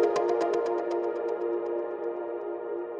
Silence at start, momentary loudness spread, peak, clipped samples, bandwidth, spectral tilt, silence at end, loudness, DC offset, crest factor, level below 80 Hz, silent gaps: 0 s; 8 LU; -14 dBFS; under 0.1%; 8.6 kHz; -5 dB/octave; 0 s; -30 LUFS; under 0.1%; 16 dB; -76 dBFS; none